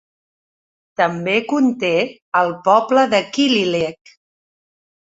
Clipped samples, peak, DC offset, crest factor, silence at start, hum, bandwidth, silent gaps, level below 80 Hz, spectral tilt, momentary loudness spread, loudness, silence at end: under 0.1%; -2 dBFS; under 0.1%; 18 dB; 1 s; none; 8 kHz; 2.22-2.32 s; -62 dBFS; -4.5 dB/octave; 6 LU; -17 LUFS; 1.1 s